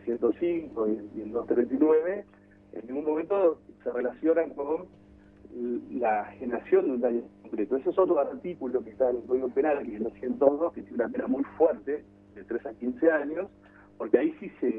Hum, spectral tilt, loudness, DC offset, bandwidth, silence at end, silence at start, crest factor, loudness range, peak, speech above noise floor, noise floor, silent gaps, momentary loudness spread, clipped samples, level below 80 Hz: 50 Hz at -55 dBFS; -9.5 dB/octave; -28 LUFS; under 0.1%; 3.8 kHz; 0 s; 0 s; 22 dB; 2 LU; -6 dBFS; 24 dB; -52 dBFS; none; 11 LU; under 0.1%; -64 dBFS